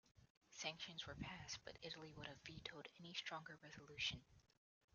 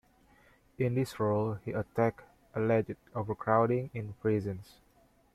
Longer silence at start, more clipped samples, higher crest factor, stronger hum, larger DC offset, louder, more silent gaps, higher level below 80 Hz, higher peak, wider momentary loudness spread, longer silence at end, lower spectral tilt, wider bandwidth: second, 0.05 s vs 0.8 s; neither; about the same, 24 dB vs 22 dB; neither; neither; second, -52 LUFS vs -32 LUFS; first, 0.30-0.41 s vs none; second, -74 dBFS vs -64 dBFS; second, -32 dBFS vs -12 dBFS; about the same, 12 LU vs 11 LU; second, 0.55 s vs 0.7 s; second, -1.5 dB/octave vs -8.5 dB/octave; second, 7.2 kHz vs 14.5 kHz